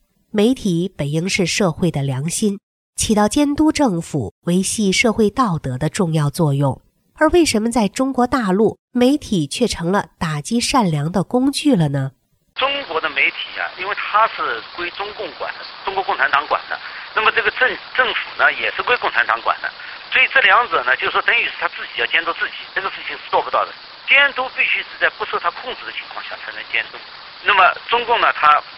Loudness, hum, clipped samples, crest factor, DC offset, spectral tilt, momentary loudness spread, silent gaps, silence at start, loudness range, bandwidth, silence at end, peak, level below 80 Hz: -18 LUFS; none; under 0.1%; 18 dB; under 0.1%; -4.5 dB/octave; 13 LU; 2.63-2.93 s, 4.31-4.42 s, 8.79-8.88 s; 0.35 s; 4 LU; 15.5 kHz; 0 s; 0 dBFS; -46 dBFS